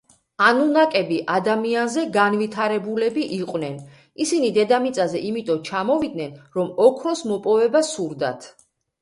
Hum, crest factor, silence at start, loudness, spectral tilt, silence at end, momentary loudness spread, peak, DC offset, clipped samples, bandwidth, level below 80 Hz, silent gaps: none; 18 dB; 0.4 s; -21 LUFS; -4.5 dB/octave; 0.5 s; 10 LU; -2 dBFS; under 0.1%; under 0.1%; 11.5 kHz; -66 dBFS; none